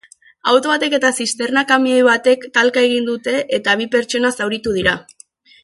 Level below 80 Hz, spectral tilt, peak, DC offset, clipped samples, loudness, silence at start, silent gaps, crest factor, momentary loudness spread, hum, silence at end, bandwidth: -52 dBFS; -3 dB/octave; 0 dBFS; under 0.1%; under 0.1%; -16 LUFS; 0.45 s; none; 16 dB; 7 LU; none; 0.6 s; 11.5 kHz